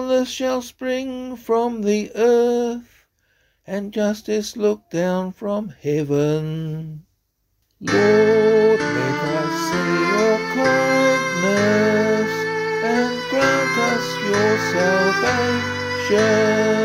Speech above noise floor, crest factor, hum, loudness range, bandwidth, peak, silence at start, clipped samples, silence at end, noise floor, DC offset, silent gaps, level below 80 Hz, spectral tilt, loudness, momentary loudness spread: 50 dB; 16 dB; none; 6 LU; 16 kHz; -4 dBFS; 0 s; under 0.1%; 0 s; -69 dBFS; under 0.1%; none; -56 dBFS; -5 dB/octave; -19 LUFS; 10 LU